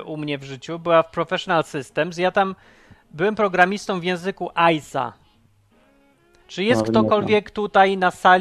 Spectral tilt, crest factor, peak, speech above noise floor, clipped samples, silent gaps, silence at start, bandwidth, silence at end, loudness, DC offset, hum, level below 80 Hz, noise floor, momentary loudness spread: -5.5 dB/octave; 20 dB; 0 dBFS; 38 dB; under 0.1%; none; 0 s; 13 kHz; 0 s; -20 LUFS; under 0.1%; none; -56 dBFS; -58 dBFS; 11 LU